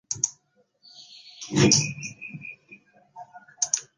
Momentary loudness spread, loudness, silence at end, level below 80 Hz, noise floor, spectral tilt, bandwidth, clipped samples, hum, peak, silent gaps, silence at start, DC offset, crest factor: 27 LU; -23 LUFS; 0.15 s; -58 dBFS; -66 dBFS; -3 dB/octave; 10.5 kHz; under 0.1%; none; -4 dBFS; none; 0.1 s; under 0.1%; 24 dB